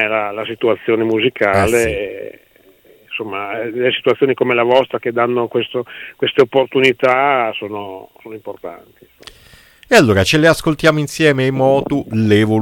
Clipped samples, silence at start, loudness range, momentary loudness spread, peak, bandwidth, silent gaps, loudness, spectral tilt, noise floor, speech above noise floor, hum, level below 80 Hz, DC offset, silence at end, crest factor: under 0.1%; 0 s; 4 LU; 17 LU; 0 dBFS; 17 kHz; none; -15 LUFS; -5.5 dB/octave; -49 dBFS; 33 dB; none; -44 dBFS; under 0.1%; 0 s; 16 dB